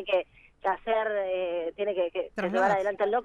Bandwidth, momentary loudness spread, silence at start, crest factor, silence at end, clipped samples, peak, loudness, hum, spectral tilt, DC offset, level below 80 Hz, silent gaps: 8.6 kHz; 6 LU; 0 s; 16 dB; 0 s; under 0.1%; -12 dBFS; -29 LUFS; none; -5.5 dB/octave; under 0.1%; -62 dBFS; none